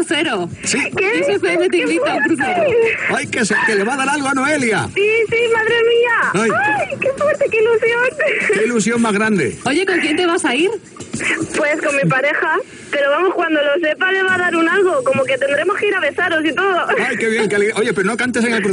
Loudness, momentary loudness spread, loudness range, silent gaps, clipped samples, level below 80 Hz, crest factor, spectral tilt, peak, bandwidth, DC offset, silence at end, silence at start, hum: -15 LUFS; 3 LU; 2 LU; none; under 0.1%; -56 dBFS; 10 dB; -4 dB/octave; -6 dBFS; 10.5 kHz; under 0.1%; 0 s; 0 s; none